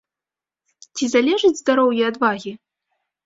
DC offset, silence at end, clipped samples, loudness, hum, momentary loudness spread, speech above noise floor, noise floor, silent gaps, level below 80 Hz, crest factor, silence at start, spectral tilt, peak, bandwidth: under 0.1%; 0.7 s; under 0.1%; -18 LUFS; none; 13 LU; 71 dB; -89 dBFS; none; -66 dBFS; 18 dB; 0.95 s; -3.5 dB/octave; -2 dBFS; 7.8 kHz